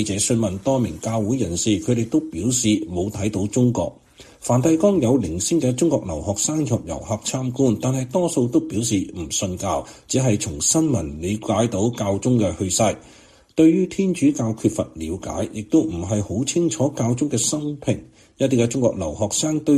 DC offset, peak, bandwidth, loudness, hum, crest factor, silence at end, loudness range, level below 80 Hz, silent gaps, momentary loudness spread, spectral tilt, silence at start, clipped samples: under 0.1%; -4 dBFS; 14 kHz; -21 LUFS; none; 16 dB; 0 s; 2 LU; -46 dBFS; none; 8 LU; -5 dB/octave; 0 s; under 0.1%